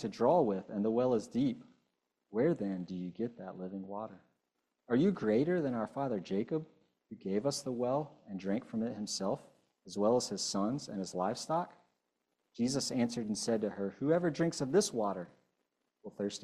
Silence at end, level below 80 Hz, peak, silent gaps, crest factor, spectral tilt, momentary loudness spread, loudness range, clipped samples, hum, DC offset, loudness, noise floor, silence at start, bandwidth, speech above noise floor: 0 s; -72 dBFS; -16 dBFS; none; 18 dB; -5.5 dB/octave; 13 LU; 4 LU; under 0.1%; none; under 0.1%; -35 LUFS; -85 dBFS; 0 s; 13.5 kHz; 51 dB